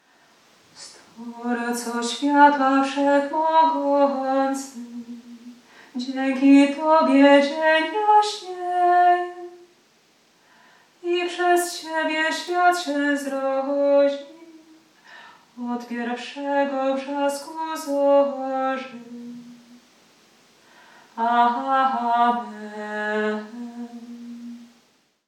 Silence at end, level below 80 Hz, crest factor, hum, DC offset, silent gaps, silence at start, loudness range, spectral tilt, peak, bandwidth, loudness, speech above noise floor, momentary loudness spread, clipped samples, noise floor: 0.65 s; -86 dBFS; 20 dB; none; under 0.1%; none; 0.8 s; 8 LU; -3 dB/octave; -2 dBFS; 14.5 kHz; -21 LUFS; 41 dB; 22 LU; under 0.1%; -62 dBFS